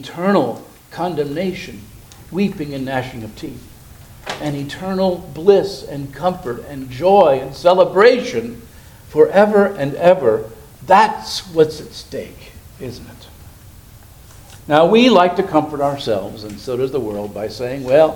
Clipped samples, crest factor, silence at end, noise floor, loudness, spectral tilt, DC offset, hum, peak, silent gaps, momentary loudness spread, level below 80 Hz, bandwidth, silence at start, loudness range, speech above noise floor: under 0.1%; 18 dB; 0 s; -41 dBFS; -16 LUFS; -6 dB/octave; under 0.1%; none; 0 dBFS; none; 20 LU; -46 dBFS; 19 kHz; 0 s; 10 LU; 25 dB